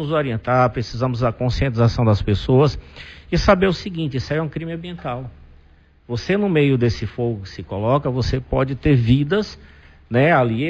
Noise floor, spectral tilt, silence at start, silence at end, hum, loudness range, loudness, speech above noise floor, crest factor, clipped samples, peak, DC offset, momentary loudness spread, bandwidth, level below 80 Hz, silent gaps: -51 dBFS; -7.5 dB/octave; 0 s; 0 s; none; 4 LU; -19 LUFS; 32 dB; 16 dB; under 0.1%; -2 dBFS; under 0.1%; 13 LU; 7.4 kHz; -34 dBFS; none